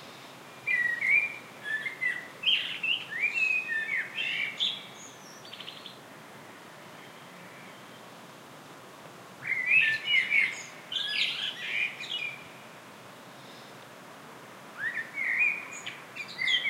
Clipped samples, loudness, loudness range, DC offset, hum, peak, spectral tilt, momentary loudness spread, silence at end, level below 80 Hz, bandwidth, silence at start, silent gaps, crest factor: under 0.1%; -28 LUFS; 19 LU; under 0.1%; none; -12 dBFS; -1 dB/octave; 24 LU; 0 s; -84 dBFS; 16 kHz; 0 s; none; 20 dB